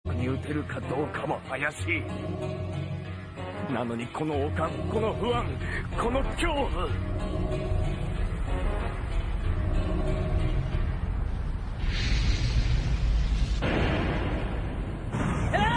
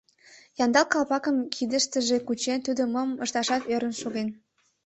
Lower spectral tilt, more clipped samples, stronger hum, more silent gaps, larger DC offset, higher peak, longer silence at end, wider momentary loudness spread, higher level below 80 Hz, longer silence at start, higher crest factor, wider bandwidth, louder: first, -6.5 dB/octave vs -2.5 dB/octave; neither; neither; neither; neither; second, -12 dBFS vs -6 dBFS; second, 0 s vs 0.5 s; about the same, 6 LU vs 8 LU; first, -32 dBFS vs -68 dBFS; second, 0.05 s vs 0.3 s; about the same, 16 dB vs 20 dB; first, 10.5 kHz vs 8.4 kHz; second, -30 LUFS vs -26 LUFS